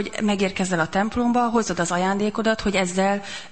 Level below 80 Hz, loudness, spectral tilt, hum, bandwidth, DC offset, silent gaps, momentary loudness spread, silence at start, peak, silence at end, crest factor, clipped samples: -46 dBFS; -22 LUFS; -4.5 dB/octave; none; 8.8 kHz; 0.7%; none; 3 LU; 0 s; -8 dBFS; 0.05 s; 14 dB; under 0.1%